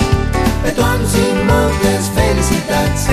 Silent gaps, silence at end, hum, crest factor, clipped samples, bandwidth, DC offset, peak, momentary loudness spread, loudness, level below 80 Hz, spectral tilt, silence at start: none; 0 s; none; 12 dB; under 0.1%; 14 kHz; under 0.1%; 0 dBFS; 3 LU; -14 LUFS; -22 dBFS; -5 dB/octave; 0 s